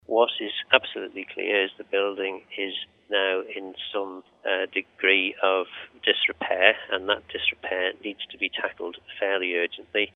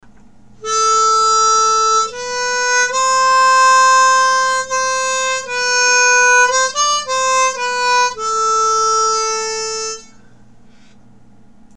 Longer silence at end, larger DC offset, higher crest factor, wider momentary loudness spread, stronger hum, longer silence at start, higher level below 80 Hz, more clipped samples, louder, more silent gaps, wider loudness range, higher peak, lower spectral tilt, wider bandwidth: second, 0.05 s vs 1.75 s; second, under 0.1% vs 0.7%; first, 26 dB vs 14 dB; first, 14 LU vs 10 LU; neither; second, 0.1 s vs 0.6 s; second, -68 dBFS vs -54 dBFS; neither; second, -25 LUFS vs -13 LUFS; neither; about the same, 4 LU vs 5 LU; about the same, 0 dBFS vs -2 dBFS; first, -5 dB/octave vs 2 dB/octave; second, 4.1 kHz vs 13 kHz